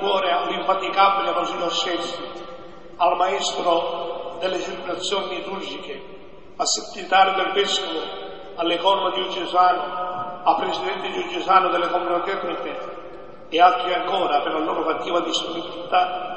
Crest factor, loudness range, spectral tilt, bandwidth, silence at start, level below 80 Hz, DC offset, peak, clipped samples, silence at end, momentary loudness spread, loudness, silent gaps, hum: 20 dB; 3 LU; -2 dB/octave; 8.6 kHz; 0 s; -58 dBFS; 0.8%; -2 dBFS; under 0.1%; 0 s; 15 LU; -22 LUFS; none; none